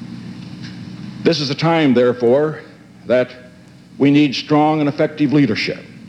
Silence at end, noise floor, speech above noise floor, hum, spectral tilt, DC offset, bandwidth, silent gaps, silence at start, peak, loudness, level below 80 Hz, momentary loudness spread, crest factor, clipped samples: 0 s; -42 dBFS; 27 dB; none; -6.5 dB/octave; under 0.1%; 8.6 kHz; none; 0 s; -2 dBFS; -16 LUFS; -60 dBFS; 18 LU; 16 dB; under 0.1%